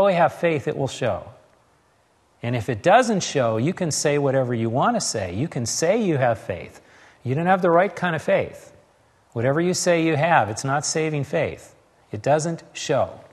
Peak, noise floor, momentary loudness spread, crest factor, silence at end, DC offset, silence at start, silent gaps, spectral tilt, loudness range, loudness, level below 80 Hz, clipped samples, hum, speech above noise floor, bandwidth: -2 dBFS; -61 dBFS; 11 LU; 20 dB; 0.1 s; under 0.1%; 0 s; none; -5 dB/octave; 2 LU; -22 LUFS; -60 dBFS; under 0.1%; none; 40 dB; 13 kHz